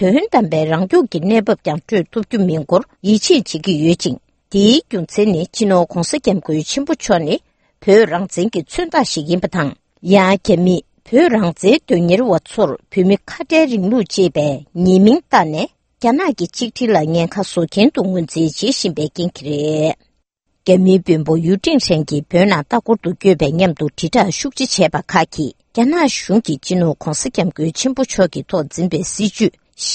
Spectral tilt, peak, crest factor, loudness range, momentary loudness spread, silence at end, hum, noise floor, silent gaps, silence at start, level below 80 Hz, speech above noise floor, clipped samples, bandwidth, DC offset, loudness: -5.5 dB/octave; 0 dBFS; 14 dB; 3 LU; 8 LU; 0 s; none; -67 dBFS; none; 0 s; -46 dBFS; 52 dB; under 0.1%; 8.8 kHz; under 0.1%; -15 LUFS